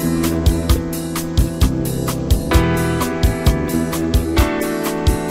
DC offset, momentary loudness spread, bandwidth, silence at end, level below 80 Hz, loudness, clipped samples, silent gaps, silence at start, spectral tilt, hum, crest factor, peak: under 0.1%; 4 LU; 16.5 kHz; 0 s; -22 dBFS; -18 LUFS; under 0.1%; none; 0 s; -5.5 dB/octave; none; 16 dB; -2 dBFS